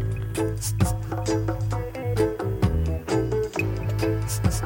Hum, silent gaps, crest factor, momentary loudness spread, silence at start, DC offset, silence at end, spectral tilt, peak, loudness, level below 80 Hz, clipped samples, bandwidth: none; none; 16 dB; 4 LU; 0 s; under 0.1%; 0 s; -6 dB/octave; -8 dBFS; -26 LUFS; -34 dBFS; under 0.1%; 17 kHz